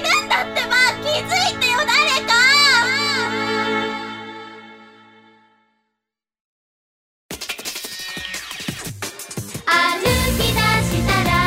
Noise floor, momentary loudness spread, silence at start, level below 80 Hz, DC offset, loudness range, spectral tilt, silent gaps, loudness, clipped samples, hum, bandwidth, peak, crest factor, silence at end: -82 dBFS; 16 LU; 0 s; -36 dBFS; under 0.1%; 18 LU; -3 dB/octave; 6.41-7.29 s; -17 LUFS; under 0.1%; none; 16.5 kHz; -4 dBFS; 18 dB; 0 s